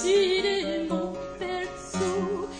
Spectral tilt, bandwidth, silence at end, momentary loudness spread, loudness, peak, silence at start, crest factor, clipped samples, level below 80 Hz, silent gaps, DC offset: -4 dB/octave; 9.8 kHz; 0 s; 11 LU; -28 LUFS; -12 dBFS; 0 s; 14 dB; under 0.1%; -52 dBFS; none; under 0.1%